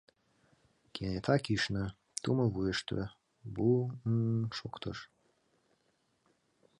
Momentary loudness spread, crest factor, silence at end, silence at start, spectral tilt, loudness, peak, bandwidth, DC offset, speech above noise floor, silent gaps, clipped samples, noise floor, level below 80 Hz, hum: 14 LU; 22 dB; 1.75 s; 0.95 s; -6 dB/octave; -34 LUFS; -14 dBFS; 11 kHz; under 0.1%; 43 dB; none; under 0.1%; -76 dBFS; -58 dBFS; none